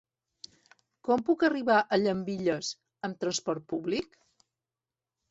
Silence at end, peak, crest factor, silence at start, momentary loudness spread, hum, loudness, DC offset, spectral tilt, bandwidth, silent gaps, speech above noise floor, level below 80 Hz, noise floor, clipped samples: 1.25 s; -10 dBFS; 20 dB; 1.05 s; 23 LU; none; -29 LUFS; under 0.1%; -4.5 dB/octave; 8 kHz; none; over 62 dB; -70 dBFS; under -90 dBFS; under 0.1%